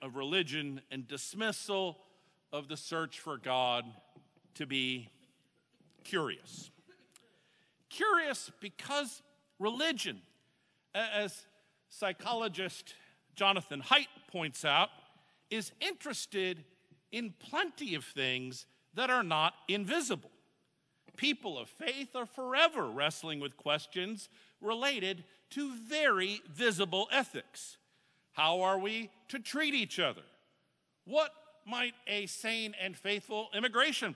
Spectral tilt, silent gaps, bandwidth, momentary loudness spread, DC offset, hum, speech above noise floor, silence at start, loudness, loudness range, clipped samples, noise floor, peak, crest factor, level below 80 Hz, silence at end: -3 dB/octave; none; 11 kHz; 15 LU; under 0.1%; none; 43 dB; 0 s; -34 LUFS; 5 LU; under 0.1%; -78 dBFS; -10 dBFS; 26 dB; under -90 dBFS; 0 s